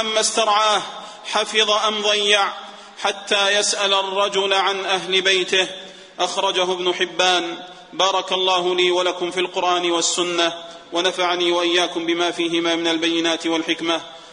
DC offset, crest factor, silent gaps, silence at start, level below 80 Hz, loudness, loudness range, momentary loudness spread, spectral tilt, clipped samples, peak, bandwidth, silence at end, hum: under 0.1%; 20 dB; none; 0 s; -68 dBFS; -19 LUFS; 1 LU; 8 LU; -1.5 dB/octave; under 0.1%; 0 dBFS; 10 kHz; 0 s; none